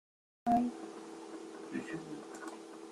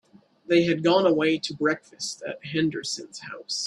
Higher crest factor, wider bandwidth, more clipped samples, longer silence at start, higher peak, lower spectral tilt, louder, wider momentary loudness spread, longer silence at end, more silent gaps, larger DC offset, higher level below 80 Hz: about the same, 20 dB vs 18 dB; about the same, 12.5 kHz vs 11.5 kHz; neither; about the same, 0.45 s vs 0.5 s; second, -20 dBFS vs -8 dBFS; about the same, -5.5 dB/octave vs -4.5 dB/octave; second, -39 LUFS vs -25 LUFS; about the same, 15 LU vs 13 LU; about the same, 0 s vs 0 s; neither; neither; about the same, -70 dBFS vs -68 dBFS